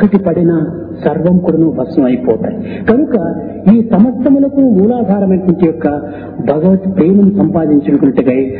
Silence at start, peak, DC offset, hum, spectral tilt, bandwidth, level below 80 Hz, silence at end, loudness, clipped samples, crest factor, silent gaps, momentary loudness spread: 0 s; 0 dBFS; under 0.1%; none; -13 dB/octave; 4.5 kHz; -40 dBFS; 0 s; -11 LUFS; 0.2%; 10 dB; none; 8 LU